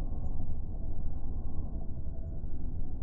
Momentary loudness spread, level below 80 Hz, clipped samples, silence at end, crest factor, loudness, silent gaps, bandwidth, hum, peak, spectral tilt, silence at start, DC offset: 2 LU; -34 dBFS; under 0.1%; 0 s; 10 dB; -41 LUFS; none; 1.1 kHz; none; -18 dBFS; -13 dB/octave; 0 s; under 0.1%